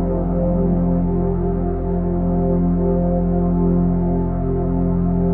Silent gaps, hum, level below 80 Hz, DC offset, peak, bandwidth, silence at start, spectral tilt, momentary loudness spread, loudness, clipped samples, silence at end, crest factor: none; none; -24 dBFS; under 0.1%; -6 dBFS; 2.3 kHz; 0 s; -15 dB/octave; 3 LU; -19 LUFS; under 0.1%; 0 s; 12 dB